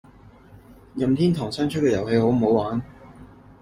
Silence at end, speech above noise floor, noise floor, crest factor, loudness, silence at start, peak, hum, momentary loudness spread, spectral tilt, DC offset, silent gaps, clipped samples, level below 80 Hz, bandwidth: 0.35 s; 28 dB; -49 dBFS; 16 dB; -22 LUFS; 0.7 s; -6 dBFS; none; 11 LU; -7.5 dB/octave; under 0.1%; none; under 0.1%; -50 dBFS; 14.5 kHz